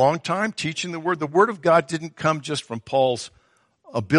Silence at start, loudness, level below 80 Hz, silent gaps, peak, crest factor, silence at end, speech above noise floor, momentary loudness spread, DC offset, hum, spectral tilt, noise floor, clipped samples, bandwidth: 0 s; -23 LUFS; -64 dBFS; none; -4 dBFS; 18 dB; 0 s; 40 dB; 11 LU; under 0.1%; none; -5 dB/octave; -61 dBFS; under 0.1%; 11.5 kHz